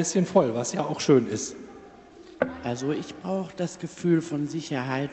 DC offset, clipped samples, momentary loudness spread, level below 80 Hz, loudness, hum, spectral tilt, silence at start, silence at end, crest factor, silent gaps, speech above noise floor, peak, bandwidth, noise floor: under 0.1%; under 0.1%; 11 LU; -64 dBFS; -27 LUFS; none; -5.5 dB/octave; 0 s; 0 s; 20 dB; none; 22 dB; -6 dBFS; 8.8 kHz; -48 dBFS